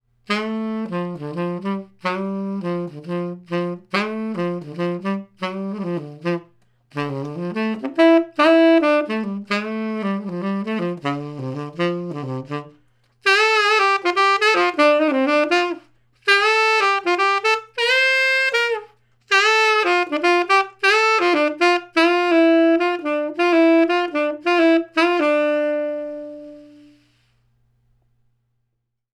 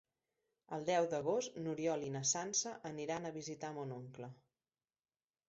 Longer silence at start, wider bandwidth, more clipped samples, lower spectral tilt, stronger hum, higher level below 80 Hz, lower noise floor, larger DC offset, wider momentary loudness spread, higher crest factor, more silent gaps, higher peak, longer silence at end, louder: second, 0.3 s vs 0.7 s; first, 12 kHz vs 8 kHz; neither; about the same, -5 dB/octave vs -4.5 dB/octave; neither; first, -70 dBFS vs -80 dBFS; second, -74 dBFS vs under -90 dBFS; neither; about the same, 13 LU vs 13 LU; about the same, 18 dB vs 18 dB; neither; first, -2 dBFS vs -24 dBFS; first, 2.5 s vs 1.15 s; first, -19 LUFS vs -39 LUFS